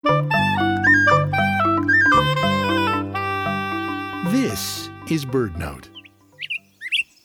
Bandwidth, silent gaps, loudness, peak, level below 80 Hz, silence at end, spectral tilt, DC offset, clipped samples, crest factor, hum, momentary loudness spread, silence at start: 18.5 kHz; none; -19 LUFS; -4 dBFS; -46 dBFS; 0.2 s; -5 dB/octave; under 0.1%; under 0.1%; 16 dB; none; 14 LU; 0.05 s